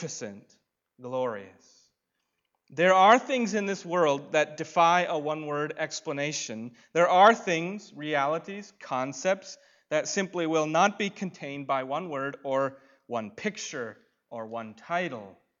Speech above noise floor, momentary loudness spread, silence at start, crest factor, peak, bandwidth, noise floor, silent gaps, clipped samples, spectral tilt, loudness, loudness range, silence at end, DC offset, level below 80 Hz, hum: 53 dB; 18 LU; 0 s; 22 dB; -6 dBFS; 7.8 kHz; -81 dBFS; none; under 0.1%; -4 dB/octave; -27 LUFS; 9 LU; 0.3 s; under 0.1%; -82 dBFS; none